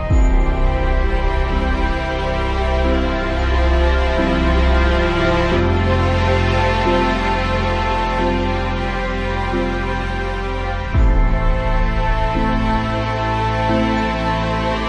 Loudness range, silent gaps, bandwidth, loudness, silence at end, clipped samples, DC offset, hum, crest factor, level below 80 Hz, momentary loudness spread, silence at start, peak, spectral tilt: 4 LU; none; 8.6 kHz; -18 LUFS; 0 s; under 0.1%; under 0.1%; none; 14 dB; -20 dBFS; 5 LU; 0 s; -4 dBFS; -7 dB/octave